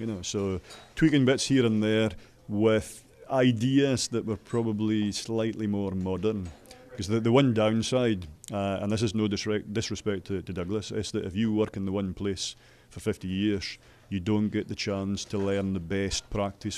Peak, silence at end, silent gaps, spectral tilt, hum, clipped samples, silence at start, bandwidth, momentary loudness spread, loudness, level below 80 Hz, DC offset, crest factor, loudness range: -8 dBFS; 0 s; none; -5.5 dB/octave; none; under 0.1%; 0 s; 13.5 kHz; 11 LU; -28 LUFS; -54 dBFS; under 0.1%; 20 dB; 5 LU